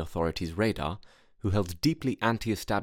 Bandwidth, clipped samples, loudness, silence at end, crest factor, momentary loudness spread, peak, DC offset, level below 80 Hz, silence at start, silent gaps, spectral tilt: 18 kHz; under 0.1%; -30 LUFS; 0 s; 20 dB; 7 LU; -10 dBFS; under 0.1%; -46 dBFS; 0 s; none; -6 dB/octave